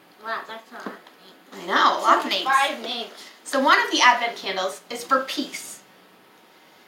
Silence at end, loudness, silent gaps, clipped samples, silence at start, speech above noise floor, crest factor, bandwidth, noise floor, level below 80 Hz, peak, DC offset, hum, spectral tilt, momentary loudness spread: 1.1 s; -21 LUFS; none; under 0.1%; 0.2 s; 30 dB; 20 dB; 16.5 kHz; -53 dBFS; -90 dBFS; -4 dBFS; under 0.1%; none; -1 dB/octave; 21 LU